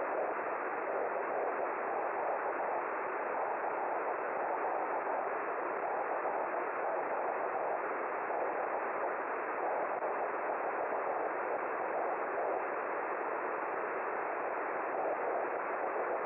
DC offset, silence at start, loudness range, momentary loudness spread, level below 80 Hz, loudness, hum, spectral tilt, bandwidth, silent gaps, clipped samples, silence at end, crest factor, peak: under 0.1%; 0 s; 0 LU; 1 LU; -84 dBFS; -36 LUFS; none; -4 dB/octave; 3.4 kHz; none; under 0.1%; 0 s; 12 dB; -24 dBFS